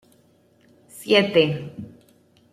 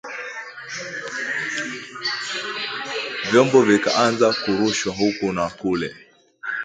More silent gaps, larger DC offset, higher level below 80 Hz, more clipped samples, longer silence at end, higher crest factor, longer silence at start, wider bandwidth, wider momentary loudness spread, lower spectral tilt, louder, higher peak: neither; neither; second, -66 dBFS vs -58 dBFS; neither; first, 0.65 s vs 0 s; about the same, 22 dB vs 20 dB; first, 0.95 s vs 0.05 s; first, 15 kHz vs 9.4 kHz; first, 23 LU vs 15 LU; first, -5.5 dB/octave vs -4 dB/octave; about the same, -20 LUFS vs -21 LUFS; about the same, -4 dBFS vs -2 dBFS